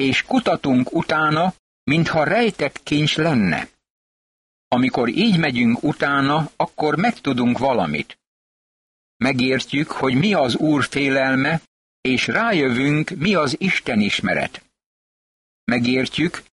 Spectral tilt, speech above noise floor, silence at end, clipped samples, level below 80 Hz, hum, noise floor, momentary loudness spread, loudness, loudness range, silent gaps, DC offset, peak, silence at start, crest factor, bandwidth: -5.5 dB/octave; over 71 dB; 0.15 s; under 0.1%; -52 dBFS; none; under -90 dBFS; 6 LU; -19 LUFS; 2 LU; 1.59-1.86 s, 3.90-4.71 s, 8.27-9.20 s, 11.67-12.03 s, 14.86-15.67 s; under 0.1%; -6 dBFS; 0 s; 14 dB; 11.5 kHz